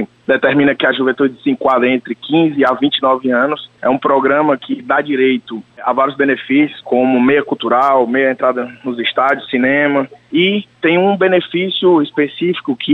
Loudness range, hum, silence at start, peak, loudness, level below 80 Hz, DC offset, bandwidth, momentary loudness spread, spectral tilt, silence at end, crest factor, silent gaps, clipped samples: 1 LU; none; 0 s; -2 dBFS; -14 LUFS; -60 dBFS; under 0.1%; 5 kHz; 6 LU; -7.5 dB/octave; 0 s; 12 dB; none; under 0.1%